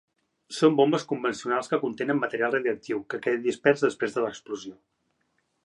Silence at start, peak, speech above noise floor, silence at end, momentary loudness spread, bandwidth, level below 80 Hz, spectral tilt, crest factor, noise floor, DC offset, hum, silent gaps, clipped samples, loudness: 0.5 s; -6 dBFS; 48 dB; 0.9 s; 12 LU; 11 kHz; -74 dBFS; -5.5 dB/octave; 20 dB; -74 dBFS; under 0.1%; none; none; under 0.1%; -26 LUFS